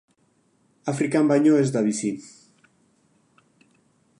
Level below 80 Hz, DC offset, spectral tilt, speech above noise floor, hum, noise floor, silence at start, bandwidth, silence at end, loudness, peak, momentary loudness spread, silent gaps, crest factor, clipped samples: -74 dBFS; under 0.1%; -6.5 dB/octave; 44 dB; none; -65 dBFS; 0.85 s; 11 kHz; 1.9 s; -22 LUFS; -8 dBFS; 14 LU; none; 18 dB; under 0.1%